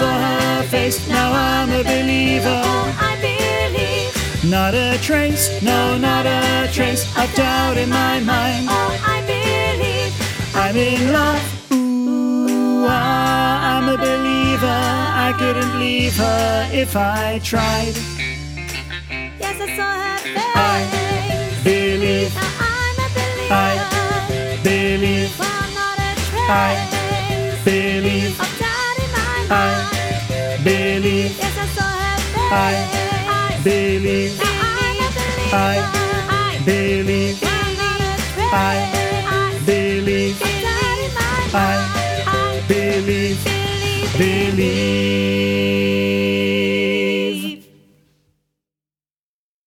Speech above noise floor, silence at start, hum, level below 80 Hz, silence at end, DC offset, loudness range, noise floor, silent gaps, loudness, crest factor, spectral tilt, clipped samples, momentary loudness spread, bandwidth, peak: over 73 dB; 0 s; none; -34 dBFS; 2.05 s; under 0.1%; 2 LU; under -90 dBFS; none; -18 LUFS; 16 dB; -4.5 dB/octave; under 0.1%; 4 LU; 17 kHz; -2 dBFS